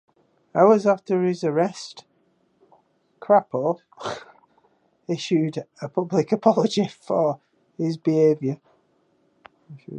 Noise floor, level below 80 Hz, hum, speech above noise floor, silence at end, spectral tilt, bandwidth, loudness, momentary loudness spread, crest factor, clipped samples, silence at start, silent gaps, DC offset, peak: -65 dBFS; -74 dBFS; none; 44 dB; 0 s; -6.5 dB/octave; 9.6 kHz; -22 LUFS; 15 LU; 20 dB; under 0.1%; 0.55 s; none; under 0.1%; -2 dBFS